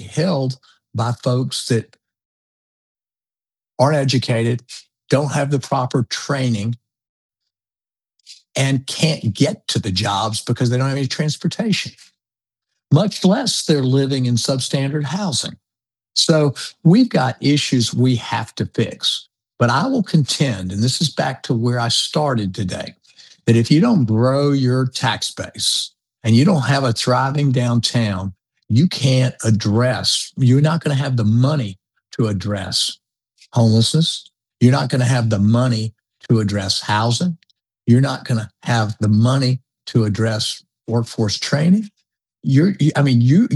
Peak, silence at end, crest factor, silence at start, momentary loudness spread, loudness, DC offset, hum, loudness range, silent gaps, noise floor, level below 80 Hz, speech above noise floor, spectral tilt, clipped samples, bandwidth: 0 dBFS; 0 s; 16 dB; 0 s; 9 LU; -18 LUFS; under 0.1%; none; 5 LU; 2.25-2.95 s, 7.09-7.29 s; under -90 dBFS; -60 dBFS; over 73 dB; -5.5 dB/octave; under 0.1%; 12 kHz